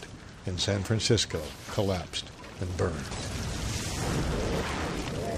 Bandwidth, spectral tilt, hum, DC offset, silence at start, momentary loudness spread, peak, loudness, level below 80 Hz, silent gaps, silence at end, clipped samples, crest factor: 15.5 kHz; -4.5 dB/octave; none; under 0.1%; 0 s; 10 LU; -12 dBFS; -31 LUFS; -42 dBFS; none; 0 s; under 0.1%; 20 dB